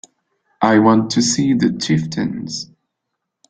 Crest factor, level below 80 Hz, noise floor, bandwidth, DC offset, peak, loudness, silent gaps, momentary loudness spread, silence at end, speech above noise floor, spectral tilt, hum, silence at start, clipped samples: 18 dB; -54 dBFS; -77 dBFS; 9.4 kHz; under 0.1%; 0 dBFS; -16 LUFS; none; 14 LU; 0.85 s; 62 dB; -4.5 dB/octave; none; 0.6 s; under 0.1%